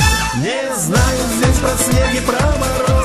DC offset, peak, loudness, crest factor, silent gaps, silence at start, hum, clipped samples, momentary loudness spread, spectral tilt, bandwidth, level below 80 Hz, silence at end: under 0.1%; -2 dBFS; -15 LUFS; 14 dB; none; 0 s; none; under 0.1%; 4 LU; -4.5 dB/octave; 13 kHz; -22 dBFS; 0 s